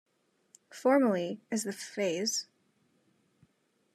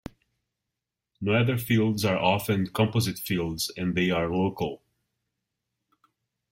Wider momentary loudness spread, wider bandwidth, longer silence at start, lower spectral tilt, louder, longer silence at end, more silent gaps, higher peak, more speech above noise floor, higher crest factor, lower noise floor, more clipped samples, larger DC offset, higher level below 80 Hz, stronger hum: about the same, 11 LU vs 9 LU; second, 14 kHz vs 16.5 kHz; second, 0.75 s vs 1.2 s; second, -3.5 dB/octave vs -5.5 dB/octave; second, -31 LUFS vs -26 LUFS; second, 1.5 s vs 1.75 s; neither; second, -14 dBFS vs -6 dBFS; second, 43 dB vs 61 dB; about the same, 20 dB vs 22 dB; second, -73 dBFS vs -86 dBFS; neither; neither; second, -88 dBFS vs -58 dBFS; neither